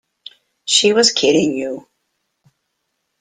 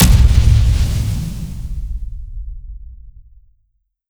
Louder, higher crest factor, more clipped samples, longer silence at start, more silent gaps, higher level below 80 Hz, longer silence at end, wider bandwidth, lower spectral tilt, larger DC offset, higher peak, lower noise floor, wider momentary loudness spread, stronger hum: about the same, -14 LUFS vs -16 LUFS; about the same, 18 dB vs 16 dB; neither; first, 0.65 s vs 0 s; neither; second, -60 dBFS vs -18 dBFS; first, 1.4 s vs 1 s; second, 9.6 kHz vs 19.5 kHz; second, -2 dB/octave vs -5.5 dB/octave; neither; about the same, 0 dBFS vs 0 dBFS; first, -72 dBFS vs -64 dBFS; second, 17 LU vs 23 LU; neither